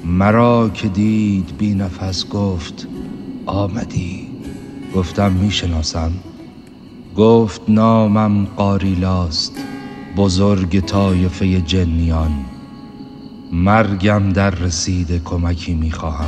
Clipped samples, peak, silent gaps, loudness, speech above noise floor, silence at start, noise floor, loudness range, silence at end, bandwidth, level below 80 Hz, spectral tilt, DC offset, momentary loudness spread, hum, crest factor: under 0.1%; 0 dBFS; none; -16 LUFS; 22 dB; 0 s; -37 dBFS; 6 LU; 0 s; 9.2 kHz; -30 dBFS; -6.5 dB/octave; under 0.1%; 16 LU; none; 16 dB